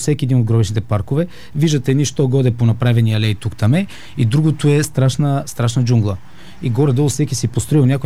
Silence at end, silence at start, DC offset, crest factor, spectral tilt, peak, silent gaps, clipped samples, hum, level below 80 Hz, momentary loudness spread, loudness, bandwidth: 0 s; 0 s; 2%; 12 dB; -6.5 dB/octave; -2 dBFS; none; under 0.1%; none; -44 dBFS; 6 LU; -16 LUFS; 14 kHz